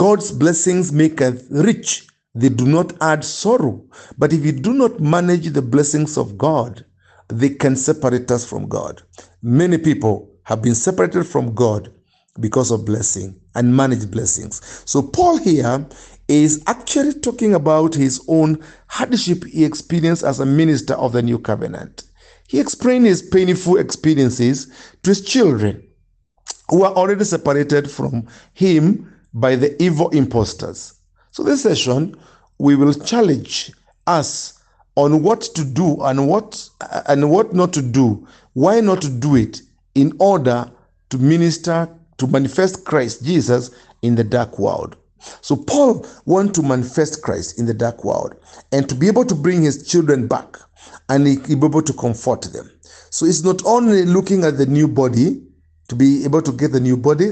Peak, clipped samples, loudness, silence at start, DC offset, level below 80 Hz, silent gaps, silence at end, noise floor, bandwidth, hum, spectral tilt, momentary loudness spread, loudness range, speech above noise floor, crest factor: -2 dBFS; under 0.1%; -17 LUFS; 0 s; under 0.1%; -50 dBFS; none; 0 s; -59 dBFS; 9.2 kHz; none; -6 dB/octave; 12 LU; 3 LU; 43 dB; 14 dB